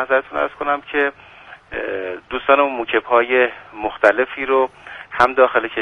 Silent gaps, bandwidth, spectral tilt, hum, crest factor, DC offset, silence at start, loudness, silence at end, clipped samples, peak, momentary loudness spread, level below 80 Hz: none; 9.6 kHz; -5 dB/octave; none; 18 dB; under 0.1%; 0 s; -18 LUFS; 0 s; under 0.1%; 0 dBFS; 12 LU; -52 dBFS